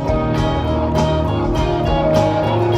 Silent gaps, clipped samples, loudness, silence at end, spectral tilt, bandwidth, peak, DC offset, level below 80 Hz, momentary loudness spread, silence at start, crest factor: none; under 0.1%; -17 LUFS; 0 s; -7.5 dB/octave; 13 kHz; 0 dBFS; under 0.1%; -26 dBFS; 3 LU; 0 s; 16 dB